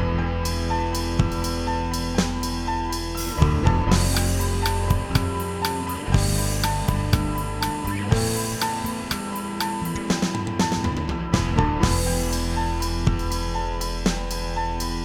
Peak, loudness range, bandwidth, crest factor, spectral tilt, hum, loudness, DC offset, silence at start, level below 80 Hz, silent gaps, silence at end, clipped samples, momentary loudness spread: -4 dBFS; 2 LU; 18.5 kHz; 20 dB; -5 dB/octave; none; -24 LUFS; under 0.1%; 0 s; -28 dBFS; none; 0 s; under 0.1%; 6 LU